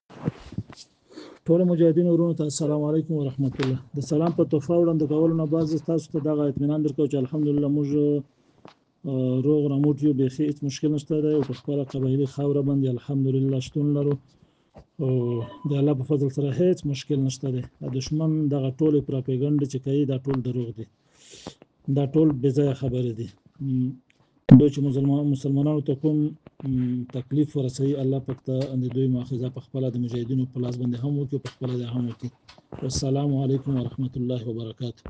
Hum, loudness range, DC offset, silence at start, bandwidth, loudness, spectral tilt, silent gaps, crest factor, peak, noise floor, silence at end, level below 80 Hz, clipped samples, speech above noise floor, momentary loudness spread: none; 6 LU; under 0.1%; 0.1 s; 9.2 kHz; -24 LUFS; -8 dB/octave; none; 24 dB; 0 dBFS; -53 dBFS; 0 s; -56 dBFS; under 0.1%; 30 dB; 10 LU